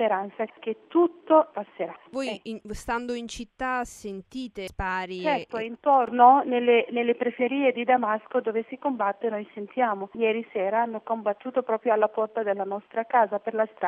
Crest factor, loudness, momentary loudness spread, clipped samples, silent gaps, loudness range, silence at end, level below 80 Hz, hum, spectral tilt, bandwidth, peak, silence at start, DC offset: 20 dB; -25 LUFS; 13 LU; under 0.1%; none; 9 LU; 0 s; -54 dBFS; none; -5 dB/octave; 12.5 kHz; -4 dBFS; 0 s; under 0.1%